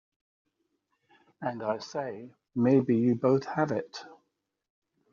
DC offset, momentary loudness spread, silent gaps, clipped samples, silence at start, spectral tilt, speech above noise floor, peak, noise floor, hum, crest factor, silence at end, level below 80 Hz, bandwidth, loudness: under 0.1%; 16 LU; none; under 0.1%; 1.4 s; -7 dB/octave; 52 dB; -12 dBFS; -79 dBFS; none; 18 dB; 1 s; -74 dBFS; 7.2 kHz; -29 LUFS